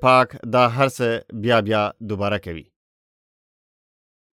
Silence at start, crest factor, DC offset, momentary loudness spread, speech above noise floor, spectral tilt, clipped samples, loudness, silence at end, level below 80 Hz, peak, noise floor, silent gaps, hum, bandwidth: 0 s; 18 dB; under 0.1%; 10 LU; over 70 dB; -6 dB/octave; under 0.1%; -20 LUFS; 1.7 s; -58 dBFS; -4 dBFS; under -90 dBFS; none; none; 15.5 kHz